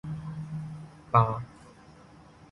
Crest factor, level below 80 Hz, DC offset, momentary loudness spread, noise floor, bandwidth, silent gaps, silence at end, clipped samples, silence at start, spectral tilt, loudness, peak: 24 dB; -56 dBFS; under 0.1%; 20 LU; -53 dBFS; 11 kHz; none; 0.05 s; under 0.1%; 0.05 s; -8.5 dB/octave; -29 LUFS; -8 dBFS